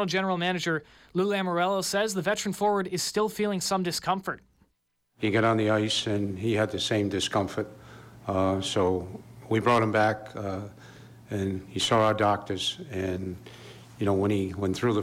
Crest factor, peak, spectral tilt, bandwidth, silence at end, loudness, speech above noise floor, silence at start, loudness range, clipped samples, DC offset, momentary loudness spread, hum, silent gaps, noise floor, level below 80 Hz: 14 dB; -14 dBFS; -4.5 dB/octave; 16.5 kHz; 0 s; -27 LUFS; 47 dB; 0 s; 2 LU; under 0.1%; under 0.1%; 12 LU; none; none; -74 dBFS; -62 dBFS